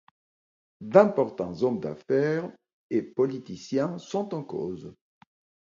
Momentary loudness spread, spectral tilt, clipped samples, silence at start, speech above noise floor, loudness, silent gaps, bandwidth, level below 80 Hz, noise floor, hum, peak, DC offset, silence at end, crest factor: 17 LU; -7.5 dB/octave; under 0.1%; 0.8 s; over 64 dB; -27 LUFS; 2.73-2.89 s; 7.4 kHz; -66 dBFS; under -90 dBFS; none; -2 dBFS; under 0.1%; 0.75 s; 24 dB